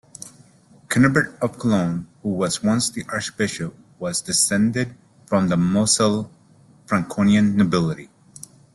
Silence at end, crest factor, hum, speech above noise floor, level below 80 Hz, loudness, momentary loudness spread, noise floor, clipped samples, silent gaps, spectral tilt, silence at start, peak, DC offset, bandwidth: 0.7 s; 18 dB; none; 32 dB; -54 dBFS; -20 LUFS; 16 LU; -52 dBFS; under 0.1%; none; -4.5 dB/octave; 0.25 s; -4 dBFS; under 0.1%; 12.5 kHz